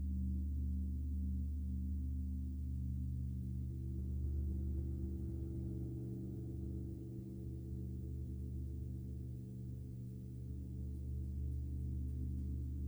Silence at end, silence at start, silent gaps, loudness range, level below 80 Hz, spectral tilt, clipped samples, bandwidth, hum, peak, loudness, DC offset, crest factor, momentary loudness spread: 0 s; 0 s; none; 4 LU; -44 dBFS; -10.5 dB/octave; under 0.1%; over 20 kHz; none; -32 dBFS; -44 LUFS; under 0.1%; 10 dB; 7 LU